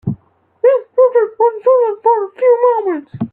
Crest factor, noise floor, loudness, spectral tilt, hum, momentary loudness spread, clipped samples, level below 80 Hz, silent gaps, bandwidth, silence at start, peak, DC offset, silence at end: 12 dB; -43 dBFS; -13 LUFS; -11.5 dB/octave; none; 9 LU; under 0.1%; -58 dBFS; none; 3.3 kHz; 0.05 s; -2 dBFS; under 0.1%; 0.05 s